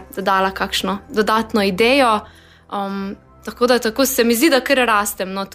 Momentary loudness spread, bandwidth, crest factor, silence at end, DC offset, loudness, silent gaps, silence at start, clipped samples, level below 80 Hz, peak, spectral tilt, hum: 12 LU; 15.5 kHz; 14 dB; 0 s; under 0.1%; -17 LUFS; none; 0 s; under 0.1%; -46 dBFS; -4 dBFS; -3.5 dB/octave; none